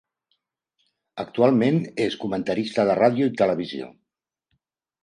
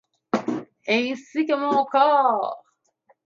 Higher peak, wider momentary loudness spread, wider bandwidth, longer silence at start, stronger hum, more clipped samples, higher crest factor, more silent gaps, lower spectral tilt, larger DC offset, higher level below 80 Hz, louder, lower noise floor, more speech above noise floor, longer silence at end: about the same, -4 dBFS vs -6 dBFS; first, 16 LU vs 13 LU; first, 10.5 kHz vs 7.6 kHz; first, 1.15 s vs 0.35 s; neither; neither; about the same, 20 dB vs 18 dB; neither; first, -7 dB/octave vs -5 dB/octave; neither; first, -64 dBFS vs -76 dBFS; about the same, -22 LUFS vs -22 LUFS; first, -83 dBFS vs -64 dBFS; first, 61 dB vs 43 dB; first, 1.15 s vs 0.7 s